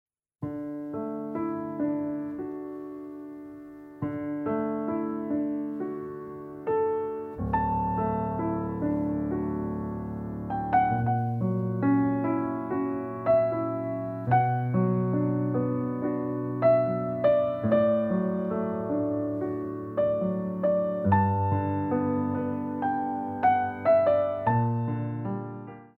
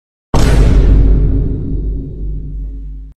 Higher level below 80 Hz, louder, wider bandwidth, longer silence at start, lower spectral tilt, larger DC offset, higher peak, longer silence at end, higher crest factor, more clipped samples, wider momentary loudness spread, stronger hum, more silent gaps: second, -52 dBFS vs -12 dBFS; second, -28 LUFS vs -14 LUFS; second, 4.3 kHz vs 10 kHz; about the same, 0.4 s vs 0.35 s; first, -11 dB/octave vs -7 dB/octave; neither; second, -10 dBFS vs 0 dBFS; about the same, 0.1 s vs 0.05 s; first, 18 dB vs 12 dB; second, under 0.1% vs 0.1%; second, 12 LU vs 15 LU; neither; neither